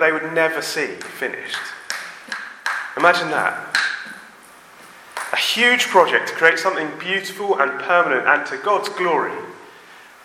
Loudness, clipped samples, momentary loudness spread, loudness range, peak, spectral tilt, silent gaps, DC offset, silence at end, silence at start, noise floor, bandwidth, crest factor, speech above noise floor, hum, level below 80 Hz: -19 LUFS; under 0.1%; 15 LU; 5 LU; 0 dBFS; -2.5 dB/octave; none; under 0.1%; 0.2 s; 0 s; -45 dBFS; 16.5 kHz; 20 dB; 26 dB; none; -72 dBFS